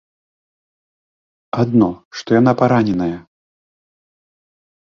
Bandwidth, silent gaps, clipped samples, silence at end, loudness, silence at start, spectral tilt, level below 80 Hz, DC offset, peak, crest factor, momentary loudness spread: 7 kHz; 2.05-2.11 s; under 0.1%; 1.65 s; -16 LUFS; 1.55 s; -8 dB/octave; -52 dBFS; under 0.1%; -2 dBFS; 18 dB; 14 LU